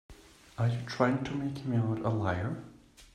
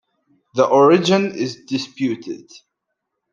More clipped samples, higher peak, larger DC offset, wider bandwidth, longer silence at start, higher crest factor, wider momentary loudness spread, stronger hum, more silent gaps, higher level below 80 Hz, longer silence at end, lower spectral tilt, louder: neither; second, -12 dBFS vs -2 dBFS; neither; about the same, 10 kHz vs 9.2 kHz; second, 0.1 s vs 0.55 s; about the same, 20 dB vs 18 dB; second, 12 LU vs 16 LU; neither; neither; first, -60 dBFS vs -66 dBFS; second, 0.1 s vs 0.95 s; first, -7.5 dB/octave vs -5.5 dB/octave; second, -32 LUFS vs -18 LUFS